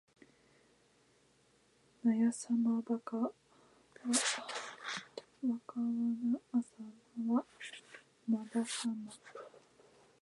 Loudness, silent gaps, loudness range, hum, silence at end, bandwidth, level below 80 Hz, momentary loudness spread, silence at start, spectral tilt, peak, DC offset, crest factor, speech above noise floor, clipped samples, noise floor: -37 LUFS; none; 3 LU; none; 0.65 s; 11.5 kHz; -88 dBFS; 19 LU; 2.05 s; -3 dB/octave; -18 dBFS; under 0.1%; 20 dB; 35 dB; under 0.1%; -70 dBFS